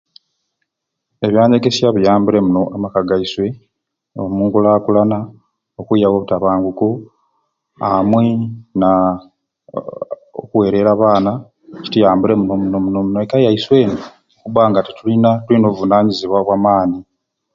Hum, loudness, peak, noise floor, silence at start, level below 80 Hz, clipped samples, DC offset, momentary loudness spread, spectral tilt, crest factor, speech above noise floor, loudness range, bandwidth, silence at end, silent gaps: none; -14 LUFS; 0 dBFS; -76 dBFS; 1.2 s; -48 dBFS; under 0.1%; under 0.1%; 15 LU; -7.5 dB/octave; 14 dB; 63 dB; 3 LU; 7.6 kHz; 0.55 s; none